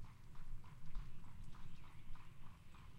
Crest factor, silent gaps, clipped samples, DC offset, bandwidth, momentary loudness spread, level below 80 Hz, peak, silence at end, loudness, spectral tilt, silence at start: 14 dB; none; under 0.1%; under 0.1%; 7.8 kHz; 5 LU; -54 dBFS; -32 dBFS; 0 s; -60 LUFS; -6 dB/octave; 0 s